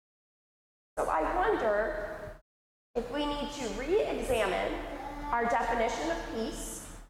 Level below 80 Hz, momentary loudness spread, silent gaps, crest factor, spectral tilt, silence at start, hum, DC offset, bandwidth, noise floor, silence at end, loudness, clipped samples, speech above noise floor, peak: -48 dBFS; 11 LU; 2.41-2.94 s; 16 dB; -4 dB/octave; 0.95 s; none; under 0.1%; 16.5 kHz; under -90 dBFS; 0 s; -32 LUFS; under 0.1%; over 59 dB; -18 dBFS